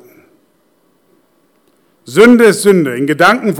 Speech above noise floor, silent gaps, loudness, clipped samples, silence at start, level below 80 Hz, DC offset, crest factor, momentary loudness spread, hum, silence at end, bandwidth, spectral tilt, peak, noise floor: 47 dB; none; -9 LUFS; 1%; 2.1 s; -54 dBFS; under 0.1%; 12 dB; 8 LU; none; 0 s; 17 kHz; -5 dB/octave; 0 dBFS; -56 dBFS